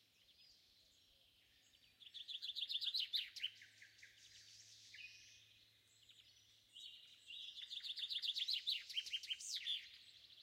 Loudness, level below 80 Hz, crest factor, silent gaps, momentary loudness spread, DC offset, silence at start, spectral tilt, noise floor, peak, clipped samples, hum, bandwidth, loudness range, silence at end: -44 LUFS; under -90 dBFS; 20 dB; none; 24 LU; under 0.1%; 0.3 s; 3 dB/octave; -73 dBFS; -30 dBFS; under 0.1%; none; 16 kHz; 16 LU; 0 s